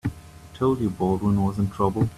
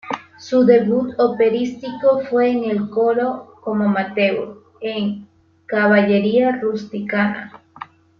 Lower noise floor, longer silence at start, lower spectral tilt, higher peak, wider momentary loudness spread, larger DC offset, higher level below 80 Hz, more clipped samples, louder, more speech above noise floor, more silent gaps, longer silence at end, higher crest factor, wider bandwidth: first, -43 dBFS vs -39 dBFS; about the same, 0.05 s vs 0.05 s; first, -9 dB/octave vs -7 dB/octave; second, -6 dBFS vs -2 dBFS; second, 7 LU vs 15 LU; neither; first, -46 dBFS vs -62 dBFS; neither; second, -24 LUFS vs -18 LUFS; about the same, 21 dB vs 22 dB; neither; second, 0 s vs 0.35 s; about the same, 16 dB vs 16 dB; first, 13.5 kHz vs 6.8 kHz